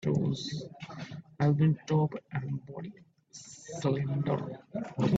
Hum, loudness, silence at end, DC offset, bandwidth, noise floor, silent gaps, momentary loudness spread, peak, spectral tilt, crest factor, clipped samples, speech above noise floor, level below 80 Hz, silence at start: none; -32 LUFS; 0 s; under 0.1%; 8 kHz; -53 dBFS; none; 18 LU; -14 dBFS; -7 dB/octave; 16 dB; under 0.1%; 22 dB; -66 dBFS; 0 s